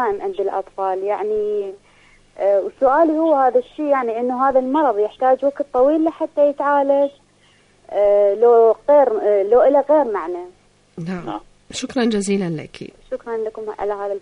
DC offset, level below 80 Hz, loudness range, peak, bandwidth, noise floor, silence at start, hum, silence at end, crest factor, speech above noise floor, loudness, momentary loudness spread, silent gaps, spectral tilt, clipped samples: under 0.1%; -54 dBFS; 9 LU; -4 dBFS; 10.5 kHz; -54 dBFS; 0 s; 50 Hz at -60 dBFS; 0 s; 14 dB; 37 dB; -18 LUFS; 15 LU; none; -6 dB/octave; under 0.1%